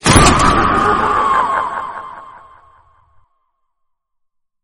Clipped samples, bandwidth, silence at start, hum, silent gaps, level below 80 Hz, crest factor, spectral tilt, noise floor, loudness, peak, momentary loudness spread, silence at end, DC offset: under 0.1%; 19 kHz; 0.05 s; none; none; -28 dBFS; 16 dB; -4 dB/octave; -67 dBFS; -13 LUFS; 0 dBFS; 21 LU; 2.3 s; under 0.1%